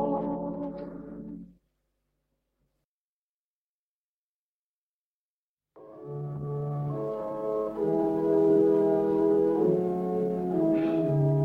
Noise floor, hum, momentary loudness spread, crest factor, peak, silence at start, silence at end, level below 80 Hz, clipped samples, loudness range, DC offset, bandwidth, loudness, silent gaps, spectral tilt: under -90 dBFS; none; 18 LU; 16 dB; -12 dBFS; 0 s; 0 s; -62 dBFS; under 0.1%; 19 LU; under 0.1%; 4.6 kHz; -27 LUFS; 2.85-5.57 s; -11 dB/octave